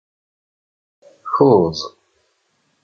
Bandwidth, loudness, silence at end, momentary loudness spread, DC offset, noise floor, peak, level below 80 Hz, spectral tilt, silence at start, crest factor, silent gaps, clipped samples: 6.8 kHz; -16 LUFS; 0.95 s; 20 LU; under 0.1%; -66 dBFS; -2 dBFS; -52 dBFS; -7.5 dB/octave; 1.25 s; 18 dB; none; under 0.1%